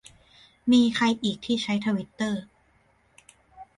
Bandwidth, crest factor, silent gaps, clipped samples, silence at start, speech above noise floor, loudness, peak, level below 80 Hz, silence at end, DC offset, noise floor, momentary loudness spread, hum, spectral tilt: 11.5 kHz; 18 dB; none; under 0.1%; 0.65 s; 40 dB; -25 LUFS; -10 dBFS; -62 dBFS; 0.15 s; under 0.1%; -64 dBFS; 9 LU; none; -5 dB/octave